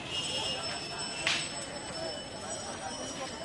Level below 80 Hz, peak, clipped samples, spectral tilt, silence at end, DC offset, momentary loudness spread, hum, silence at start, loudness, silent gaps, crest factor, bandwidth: -60 dBFS; -10 dBFS; under 0.1%; -1.5 dB/octave; 0 s; under 0.1%; 8 LU; none; 0 s; -34 LUFS; none; 26 dB; 11.5 kHz